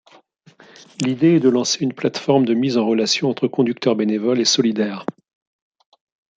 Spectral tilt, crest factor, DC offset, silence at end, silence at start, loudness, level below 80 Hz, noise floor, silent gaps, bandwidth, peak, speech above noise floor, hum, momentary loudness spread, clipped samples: -4.5 dB/octave; 16 dB; under 0.1%; 1.25 s; 1 s; -18 LUFS; -68 dBFS; -51 dBFS; none; 9.2 kHz; -4 dBFS; 33 dB; none; 8 LU; under 0.1%